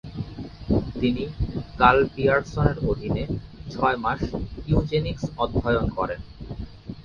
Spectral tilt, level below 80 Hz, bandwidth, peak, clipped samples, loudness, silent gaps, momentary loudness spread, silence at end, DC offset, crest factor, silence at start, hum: -7.5 dB/octave; -36 dBFS; 7.2 kHz; -2 dBFS; under 0.1%; -24 LUFS; none; 17 LU; 0 s; under 0.1%; 22 dB; 0.05 s; none